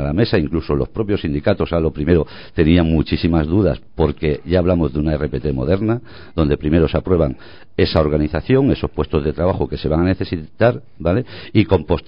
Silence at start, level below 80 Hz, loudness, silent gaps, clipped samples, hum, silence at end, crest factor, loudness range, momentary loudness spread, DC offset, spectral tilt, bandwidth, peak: 0 s; -28 dBFS; -18 LUFS; none; under 0.1%; none; 0.05 s; 16 dB; 2 LU; 6 LU; 1%; -11 dB/octave; 5.4 kHz; 0 dBFS